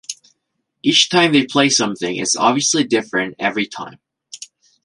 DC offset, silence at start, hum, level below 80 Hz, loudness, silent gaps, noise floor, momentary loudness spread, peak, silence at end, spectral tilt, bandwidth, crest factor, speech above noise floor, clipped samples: under 0.1%; 0.1 s; none; -64 dBFS; -16 LUFS; none; -73 dBFS; 22 LU; 0 dBFS; 0.4 s; -2.5 dB/octave; 11.5 kHz; 18 dB; 57 dB; under 0.1%